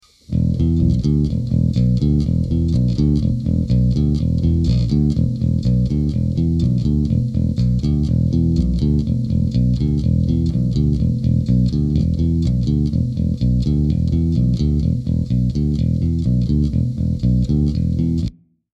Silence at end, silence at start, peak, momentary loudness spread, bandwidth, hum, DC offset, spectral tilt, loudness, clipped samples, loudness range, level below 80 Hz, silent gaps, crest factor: 0.4 s; 0.3 s; -4 dBFS; 3 LU; 7.6 kHz; none; under 0.1%; -10 dB/octave; -18 LUFS; under 0.1%; 1 LU; -24 dBFS; none; 12 dB